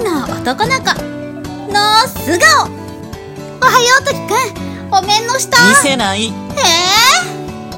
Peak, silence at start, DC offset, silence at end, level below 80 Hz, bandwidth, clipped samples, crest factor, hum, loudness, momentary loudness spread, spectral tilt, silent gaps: 0 dBFS; 0 s; under 0.1%; 0 s; -42 dBFS; over 20 kHz; 0.4%; 12 dB; none; -11 LUFS; 18 LU; -2 dB/octave; none